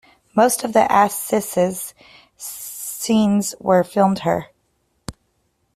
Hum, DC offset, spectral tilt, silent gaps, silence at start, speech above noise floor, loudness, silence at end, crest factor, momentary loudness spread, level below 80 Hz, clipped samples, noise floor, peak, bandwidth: none; under 0.1%; -5 dB/octave; none; 0.35 s; 49 dB; -19 LUFS; 0.65 s; 18 dB; 18 LU; -56 dBFS; under 0.1%; -67 dBFS; -2 dBFS; 16 kHz